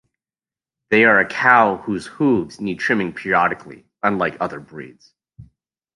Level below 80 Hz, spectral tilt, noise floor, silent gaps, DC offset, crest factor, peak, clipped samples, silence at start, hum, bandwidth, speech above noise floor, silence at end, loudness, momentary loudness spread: -58 dBFS; -6 dB/octave; under -90 dBFS; none; under 0.1%; 18 dB; -2 dBFS; under 0.1%; 0.9 s; none; 11.5 kHz; over 72 dB; 0.5 s; -18 LUFS; 14 LU